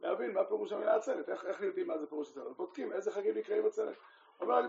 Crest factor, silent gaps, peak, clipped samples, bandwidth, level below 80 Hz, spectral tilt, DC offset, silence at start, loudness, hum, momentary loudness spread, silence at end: 18 dB; none; -18 dBFS; under 0.1%; 7.6 kHz; under -90 dBFS; -3 dB/octave; under 0.1%; 0 s; -36 LUFS; none; 10 LU; 0 s